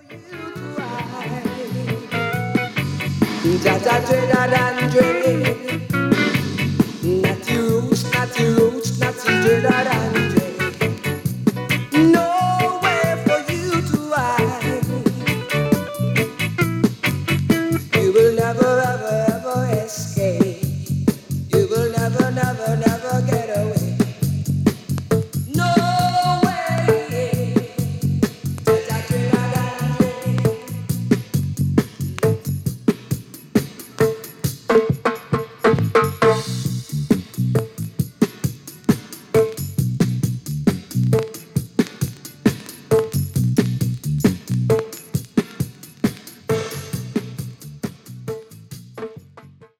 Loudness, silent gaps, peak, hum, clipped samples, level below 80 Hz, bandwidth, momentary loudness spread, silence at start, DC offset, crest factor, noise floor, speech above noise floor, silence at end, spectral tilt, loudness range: -20 LUFS; none; -2 dBFS; none; under 0.1%; -48 dBFS; 17.5 kHz; 11 LU; 0.1 s; under 0.1%; 16 dB; -45 dBFS; 28 dB; 0.15 s; -6 dB/octave; 4 LU